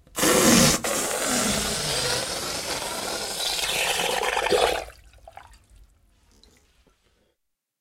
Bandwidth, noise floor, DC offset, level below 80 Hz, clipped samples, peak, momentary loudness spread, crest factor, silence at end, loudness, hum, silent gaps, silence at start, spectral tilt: 16 kHz; -77 dBFS; under 0.1%; -46 dBFS; under 0.1%; -4 dBFS; 11 LU; 22 dB; 1.95 s; -22 LUFS; none; none; 0.15 s; -2 dB/octave